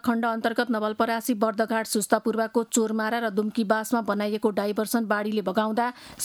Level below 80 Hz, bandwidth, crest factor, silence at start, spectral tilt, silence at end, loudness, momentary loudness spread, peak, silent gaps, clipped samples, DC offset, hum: -68 dBFS; 18.5 kHz; 18 dB; 0.05 s; -4 dB/octave; 0 s; -25 LUFS; 2 LU; -6 dBFS; none; under 0.1%; under 0.1%; none